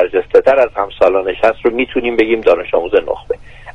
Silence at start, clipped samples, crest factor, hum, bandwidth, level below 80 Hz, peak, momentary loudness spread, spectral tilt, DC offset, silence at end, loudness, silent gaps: 0 s; under 0.1%; 14 dB; none; 7.2 kHz; -40 dBFS; 0 dBFS; 8 LU; -6 dB/octave; under 0.1%; 0.05 s; -13 LUFS; none